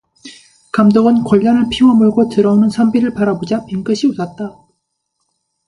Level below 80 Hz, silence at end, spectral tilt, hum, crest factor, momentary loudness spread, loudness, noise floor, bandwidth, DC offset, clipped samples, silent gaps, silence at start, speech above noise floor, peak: -48 dBFS; 1.15 s; -7 dB/octave; none; 14 dB; 11 LU; -13 LUFS; -70 dBFS; 11 kHz; under 0.1%; under 0.1%; none; 0.25 s; 58 dB; 0 dBFS